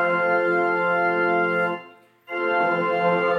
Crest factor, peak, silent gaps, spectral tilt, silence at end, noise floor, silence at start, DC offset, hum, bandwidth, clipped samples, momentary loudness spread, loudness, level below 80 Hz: 14 dB; -8 dBFS; none; -7 dB/octave; 0 s; -47 dBFS; 0 s; under 0.1%; none; 7.6 kHz; under 0.1%; 7 LU; -21 LUFS; -80 dBFS